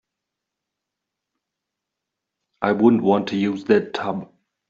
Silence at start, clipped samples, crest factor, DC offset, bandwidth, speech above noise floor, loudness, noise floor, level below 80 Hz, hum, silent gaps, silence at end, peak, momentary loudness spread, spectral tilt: 2.6 s; under 0.1%; 20 dB; under 0.1%; 7.4 kHz; 64 dB; -20 LUFS; -83 dBFS; -68 dBFS; none; none; 0.45 s; -4 dBFS; 11 LU; -5.5 dB/octave